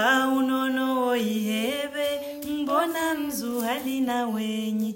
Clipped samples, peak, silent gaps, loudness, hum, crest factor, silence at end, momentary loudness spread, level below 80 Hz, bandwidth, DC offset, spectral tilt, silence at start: under 0.1%; -10 dBFS; none; -26 LUFS; none; 16 dB; 0 s; 5 LU; -64 dBFS; 16.5 kHz; under 0.1%; -4 dB/octave; 0 s